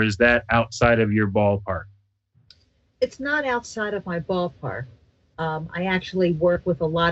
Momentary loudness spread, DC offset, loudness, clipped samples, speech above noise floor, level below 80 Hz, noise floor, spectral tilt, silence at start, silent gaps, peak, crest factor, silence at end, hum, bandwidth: 12 LU; under 0.1%; -23 LUFS; under 0.1%; 41 dB; -46 dBFS; -63 dBFS; -6 dB/octave; 0 s; none; -4 dBFS; 20 dB; 0 s; none; 8.2 kHz